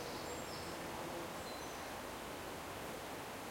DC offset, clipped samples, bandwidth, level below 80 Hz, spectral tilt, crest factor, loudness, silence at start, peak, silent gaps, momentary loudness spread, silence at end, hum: under 0.1%; under 0.1%; 16.5 kHz; -64 dBFS; -3.5 dB/octave; 14 dB; -46 LUFS; 0 s; -32 dBFS; none; 2 LU; 0 s; none